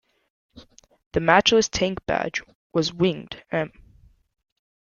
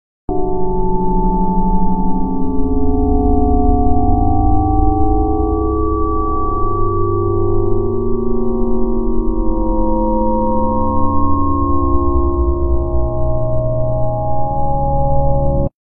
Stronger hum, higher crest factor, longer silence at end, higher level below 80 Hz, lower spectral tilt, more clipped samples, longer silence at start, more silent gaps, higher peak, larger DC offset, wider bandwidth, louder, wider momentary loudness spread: neither; first, 24 dB vs 12 dB; first, 1.3 s vs 0.15 s; second, -50 dBFS vs -18 dBFS; second, -4 dB/octave vs -17.5 dB/octave; neither; first, 0.55 s vs 0.3 s; first, 1.06-1.11 s, 2.55-2.70 s vs none; about the same, -2 dBFS vs 0 dBFS; neither; first, 7.4 kHz vs 1.3 kHz; second, -23 LUFS vs -17 LUFS; first, 13 LU vs 4 LU